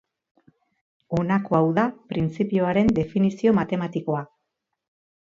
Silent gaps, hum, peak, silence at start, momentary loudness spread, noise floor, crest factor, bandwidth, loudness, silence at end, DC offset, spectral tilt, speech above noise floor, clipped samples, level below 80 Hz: none; none; -6 dBFS; 1.1 s; 8 LU; -80 dBFS; 18 dB; 7.4 kHz; -23 LUFS; 0.95 s; under 0.1%; -8.5 dB/octave; 58 dB; under 0.1%; -52 dBFS